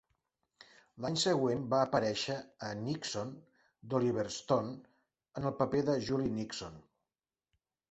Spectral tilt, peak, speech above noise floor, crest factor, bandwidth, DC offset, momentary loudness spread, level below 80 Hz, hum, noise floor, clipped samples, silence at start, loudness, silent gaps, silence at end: -5 dB/octave; -14 dBFS; over 56 dB; 20 dB; 8.2 kHz; under 0.1%; 13 LU; -66 dBFS; none; under -90 dBFS; under 0.1%; 0.95 s; -34 LUFS; none; 1.1 s